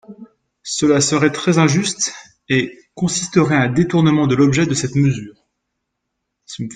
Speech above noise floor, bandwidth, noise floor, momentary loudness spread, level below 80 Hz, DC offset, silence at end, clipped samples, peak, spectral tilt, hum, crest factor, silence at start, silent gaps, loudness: 60 dB; 9.6 kHz; -76 dBFS; 11 LU; -52 dBFS; under 0.1%; 0 s; under 0.1%; 0 dBFS; -5 dB/octave; none; 16 dB; 0.1 s; none; -16 LUFS